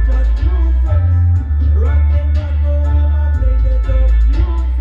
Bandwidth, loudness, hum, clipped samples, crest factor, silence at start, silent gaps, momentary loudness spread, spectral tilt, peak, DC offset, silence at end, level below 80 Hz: 4.1 kHz; -15 LUFS; none; under 0.1%; 8 dB; 0 s; none; 3 LU; -9.5 dB/octave; -4 dBFS; under 0.1%; 0 s; -12 dBFS